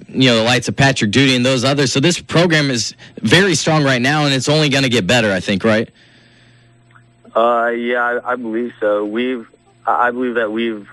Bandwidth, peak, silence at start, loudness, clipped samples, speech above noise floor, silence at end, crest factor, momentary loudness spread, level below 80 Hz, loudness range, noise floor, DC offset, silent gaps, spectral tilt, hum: 12.5 kHz; 0 dBFS; 0 s; -15 LUFS; under 0.1%; 33 dB; 0 s; 16 dB; 8 LU; -48 dBFS; 5 LU; -48 dBFS; under 0.1%; none; -4.5 dB/octave; 60 Hz at -45 dBFS